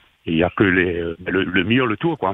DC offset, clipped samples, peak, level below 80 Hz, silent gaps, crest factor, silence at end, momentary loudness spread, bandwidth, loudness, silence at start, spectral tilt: under 0.1%; under 0.1%; -2 dBFS; -48 dBFS; none; 16 dB; 0 s; 6 LU; 3.9 kHz; -19 LUFS; 0.25 s; -9 dB/octave